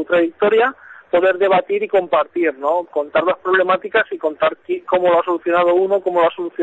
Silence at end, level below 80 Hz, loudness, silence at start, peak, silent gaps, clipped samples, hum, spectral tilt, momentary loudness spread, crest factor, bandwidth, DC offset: 0 s; -62 dBFS; -17 LUFS; 0 s; -4 dBFS; none; under 0.1%; none; -7 dB/octave; 5 LU; 14 dB; 4.2 kHz; under 0.1%